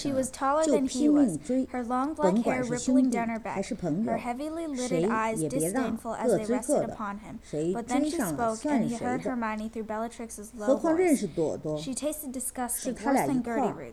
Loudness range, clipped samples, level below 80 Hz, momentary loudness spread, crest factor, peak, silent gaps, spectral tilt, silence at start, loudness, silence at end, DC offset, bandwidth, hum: 4 LU; under 0.1%; -56 dBFS; 9 LU; 18 dB; -10 dBFS; none; -5 dB/octave; 0 s; -28 LUFS; 0 s; under 0.1%; 14.5 kHz; none